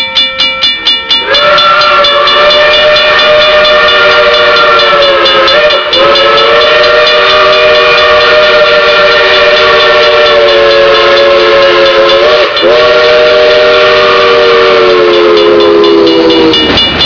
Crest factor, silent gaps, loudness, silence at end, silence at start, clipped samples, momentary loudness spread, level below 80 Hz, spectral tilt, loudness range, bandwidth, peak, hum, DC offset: 4 dB; none; -3 LUFS; 0 s; 0 s; 7%; 2 LU; -34 dBFS; -3.5 dB/octave; 1 LU; 5.4 kHz; 0 dBFS; none; 0.4%